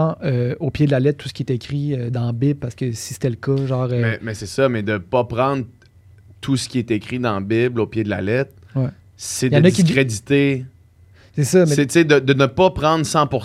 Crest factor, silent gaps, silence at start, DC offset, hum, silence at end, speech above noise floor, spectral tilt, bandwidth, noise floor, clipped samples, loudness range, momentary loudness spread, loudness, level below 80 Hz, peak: 18 dB; none; 0 s; under 0.1%; none; 0 s; 31 dB; -6 dB/octave; 14.5 kHz; -49 dBFS; under 0.1%; 5 LU; 11 LU; -19 LUFS; -48 dBFS; 0 dBFS